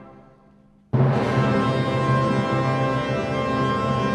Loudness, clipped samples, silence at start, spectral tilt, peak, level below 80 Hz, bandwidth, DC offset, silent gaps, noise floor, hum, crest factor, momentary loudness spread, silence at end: -22 LUFS; under 0.1%; 0 s; -7.5 dB/octave; -8 dBFS; -48 dBFS; 9.8 kHz; under 0.1%; none; -54 dBFS; none; 14 dB; 4 LU; 0 s